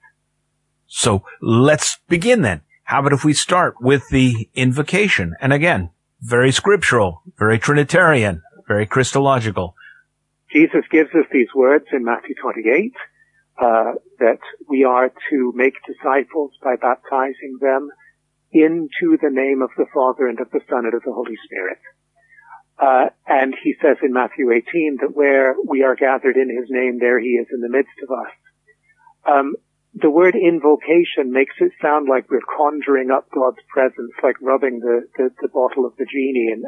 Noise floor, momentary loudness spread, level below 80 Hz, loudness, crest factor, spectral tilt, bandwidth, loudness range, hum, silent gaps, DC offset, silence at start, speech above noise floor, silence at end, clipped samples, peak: -69 dBFS; 9 LU; -50 dBFS; -17 LUFS; 16 dB; -5.5 dB/octave; 11.5 kHz; 4 LU; none; none; under 0.1%; 0.9 s; 52 dB; 0 s; under 0.1%; -2 dBFS